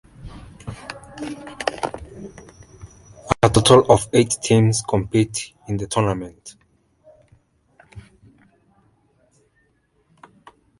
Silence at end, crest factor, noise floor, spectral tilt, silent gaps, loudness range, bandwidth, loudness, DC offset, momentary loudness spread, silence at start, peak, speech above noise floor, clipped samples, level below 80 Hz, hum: 2.8 s; 22 dB; -64 dBFS; -5 dB/octave; none; 13 LU; 11.5 kHz; -19 LUFS; under 0.1%; 27 LU; 0.25 s; 0 dBFS; 46 dB; under 0.1%; -44 dBFS; none